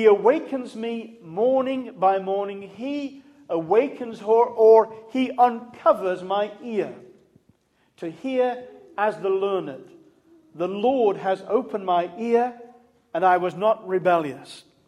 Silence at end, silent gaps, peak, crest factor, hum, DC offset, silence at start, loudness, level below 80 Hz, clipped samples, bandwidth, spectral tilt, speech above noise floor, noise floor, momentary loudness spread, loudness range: 0.25 s; none; -4 dBFS; 20 dB; none; under 0.1%; 0 s; -23 LUFS; -74 dBFS; under 0.1%; 11 kHz; -6.5 dB/octave; 41 dB; -63 dBFS; 14 LU; 7 LU